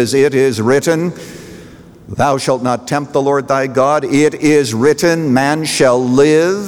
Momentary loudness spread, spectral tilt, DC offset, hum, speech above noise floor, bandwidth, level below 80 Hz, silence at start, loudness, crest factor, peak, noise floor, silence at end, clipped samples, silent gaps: 7 LU; -5 dB/octave; 0.2%; none; 24 dB; 19 kHz; -50 dBFS; 0 s; -13 LUFS; 12 dB; -2 dBFS; -37 dBFS; 0 s; under 0.1%; none